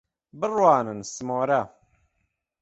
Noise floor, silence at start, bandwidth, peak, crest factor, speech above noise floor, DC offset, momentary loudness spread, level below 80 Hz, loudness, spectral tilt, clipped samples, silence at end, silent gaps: -76 dBFS; 0.35 s; 8.2 kHz; -4 dBFS; 22 dB; 52 dB; under 0.1%; 13 LU; -66 dBFS; -24 LUFS; -5.5 dB/octave; under 0.1%; 0.95 s; none